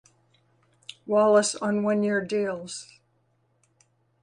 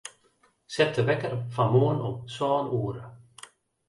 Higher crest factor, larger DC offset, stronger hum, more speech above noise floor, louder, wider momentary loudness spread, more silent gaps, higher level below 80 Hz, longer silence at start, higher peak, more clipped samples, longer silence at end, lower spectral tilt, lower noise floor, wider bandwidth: about the same, 18 dB vs 18 dB; neither; neither; first, 45 dB vs 40 dB; first, -24 LUFS vs -27 LUFS; about the same, 22 LU vs 24 LU; neither; second, -74 dBFS vs -62 dBFS; first, 1.05 s vs 0.05 s; about the same, -8 dBFS vs -10 dBFS; neither; first, 1.4 s vs 0.7 s; second, -4.5 dB/octave vs -6.5 dB/octave; about the same, -69 dBFS vs -66 dBFS; about the same, 11 kHz vs 11.5 kHz